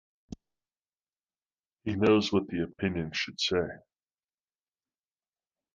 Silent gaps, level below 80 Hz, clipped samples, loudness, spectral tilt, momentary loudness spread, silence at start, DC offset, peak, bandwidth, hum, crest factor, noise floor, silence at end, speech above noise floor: 0.79-0.83 s, 0.89-0.97 s, 1.09-1.13 s, 1.53-1.77 s; -56 dBFS; under 0.1%; -29 LUFS; -5.5 dB/octave; 25 LU; 0.3 s; under 0.1%; -12 dBFS; 7.6 kHz; none; 20 dB; under -90 dBFS; 1.95 s; over 61 dB